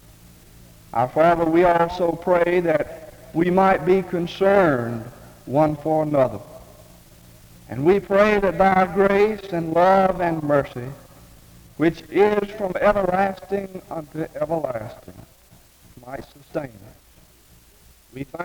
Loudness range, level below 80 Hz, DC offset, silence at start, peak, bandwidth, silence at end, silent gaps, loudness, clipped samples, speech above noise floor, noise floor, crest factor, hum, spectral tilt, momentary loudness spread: 12 LU; -48 dBFS; under 0.1%; 0.95 s; -4 dBFS; over 20 kHz; 0 s; none; -20 LUFS; under 0.1%; 32 dB; -52 dBFS; 18 dB; none; -7.5 dB/octave; 18 LU